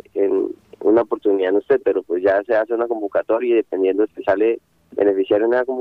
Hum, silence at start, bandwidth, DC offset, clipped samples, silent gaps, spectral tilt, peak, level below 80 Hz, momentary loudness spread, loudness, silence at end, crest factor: none; 0.15 s; 4.7 kHz; under 0.1%; under 0.1%; none; -7.5 dB/octave; -4 dBFS; -62 dBFS; 5 LU; -19 LUFS; 0 s; 14 dB